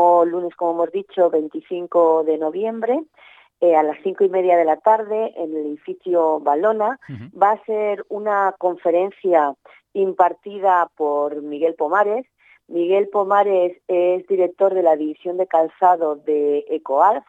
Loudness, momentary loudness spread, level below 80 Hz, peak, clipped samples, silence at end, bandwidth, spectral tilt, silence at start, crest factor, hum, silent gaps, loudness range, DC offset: -19 LUFS; 8 LU; -78 dBFS; -2 dBFS; under 0.1%; 0.1 s; 7.6 kHz; -7.5 dB/octave; 0 s; 16 dB; none; none; 2 LU; under 0.1%